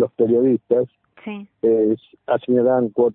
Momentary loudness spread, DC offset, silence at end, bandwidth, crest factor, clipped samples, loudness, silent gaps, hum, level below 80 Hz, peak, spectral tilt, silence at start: 16 LU; under 0.1%; 0 s; 3.9 kHz; 14 dB; under 0.1%; -19 LUFS; none; none; -64 dBFS; -6 dBFS; -12.5 dB/octave; 0 s